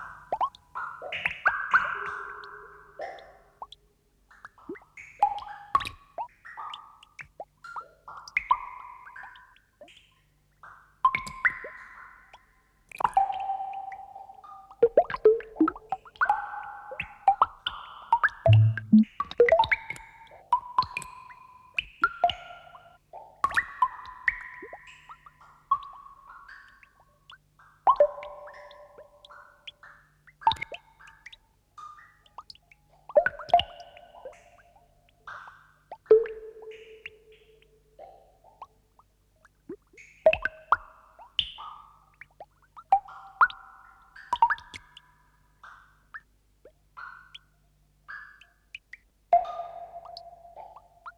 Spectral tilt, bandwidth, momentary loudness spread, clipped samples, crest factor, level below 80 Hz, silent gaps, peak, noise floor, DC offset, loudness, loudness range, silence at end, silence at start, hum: -6.5 dB/octave; 11.5 kHz; 26 LU; under 0.1%; 22 dB; -60 dBFS; none; -8 dBFS; -66 dBFS; under 0.1%; -27 LUFS; 11 LU; 0.1 s; 0 s; none